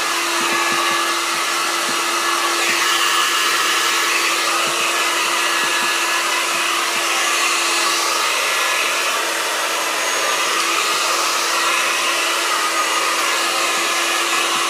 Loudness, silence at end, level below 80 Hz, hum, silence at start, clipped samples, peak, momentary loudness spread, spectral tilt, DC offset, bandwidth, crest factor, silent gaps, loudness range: -16 LUFS; 0 s; -86 dBFS; none; 0 s; under 0.1%; -4 dBFS; 3 LU; 1 dB/octave; under 0.1%; 15.5 kHz; 14 dB; none; 1 LU